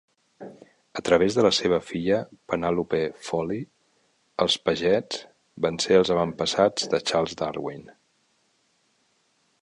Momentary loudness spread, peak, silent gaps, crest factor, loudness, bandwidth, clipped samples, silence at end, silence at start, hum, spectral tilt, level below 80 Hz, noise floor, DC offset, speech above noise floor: 17 LU; -4 dBFS; none; 22 dB; -24 LUFS; 11 kHz; under 0.1%; 1.8 s; 0.4 s; none; -4.5 dB/octave; -58 dBFS; -68 dBFS; under 0.1%; 44 dB